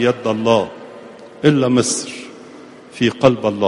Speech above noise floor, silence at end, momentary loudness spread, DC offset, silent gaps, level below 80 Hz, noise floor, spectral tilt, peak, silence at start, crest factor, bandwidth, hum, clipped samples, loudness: 23 dB; 0 s; 22 LU; under 0.1%; none; -54 dBFS; -39 dBFS; -5 dB/octave; 0 dBFS; 0 s; 18 dB; 11.5 kHz; none; under 0.1%; -16 LUFS